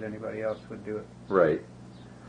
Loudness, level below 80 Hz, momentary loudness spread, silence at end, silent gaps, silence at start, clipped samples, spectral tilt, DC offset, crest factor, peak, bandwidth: -30 LUFS; -60 dBFS; 23 LU; 0 s; none; 0 s; under 0.1%; -8 dB/octave; under 0.1%; 22 dB; -8 dBFS; 9.8 kHz